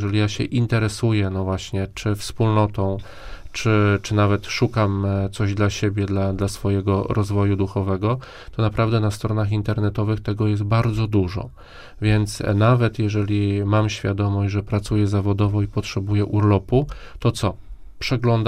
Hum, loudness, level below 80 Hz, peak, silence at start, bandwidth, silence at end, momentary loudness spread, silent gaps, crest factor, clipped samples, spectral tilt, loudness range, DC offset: none; -21 LUFS; -40 dBFS; -4 dBFS; 0 s; 11.5 kHz; 0 s; 7 LU; none; 16 dB; under 0.1%; -7 dB/octave; 2 LU; under 0.1%